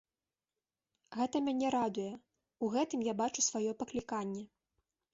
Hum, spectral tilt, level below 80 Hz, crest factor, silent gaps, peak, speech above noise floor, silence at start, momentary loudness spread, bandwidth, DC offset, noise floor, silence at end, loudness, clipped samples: none; -4.5 dB/octave; -74 dBFS; 18 dB; none; -20 dBFS; over 55 dB; 1.1 s; 13 LU; 7.6 kHz; under 0.1%; under -90 dBFS; 0.65 s; -35 LUFS; under 0.1%